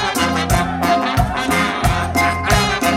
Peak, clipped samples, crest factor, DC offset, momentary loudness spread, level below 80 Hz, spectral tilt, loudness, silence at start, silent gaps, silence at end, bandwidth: -2 dBFS; under 0.1%; 14 dB; under 0.1%; 3 LU; -28 dBFS; -4.5 dB/octave; -16 LUFS; 0 s; none; 0 s; 16.5 kHz